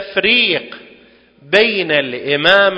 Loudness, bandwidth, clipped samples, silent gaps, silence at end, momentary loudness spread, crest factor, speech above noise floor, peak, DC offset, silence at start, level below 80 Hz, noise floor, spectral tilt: -13 LUFS; 8 kHz; 0.1%; none; 0 s; 8 LU; 16 dB; 32 dB; 0 dBFS; under 0.1%; 0 s; -56 dBFS; -46 dBFS; -4.5 dB/octave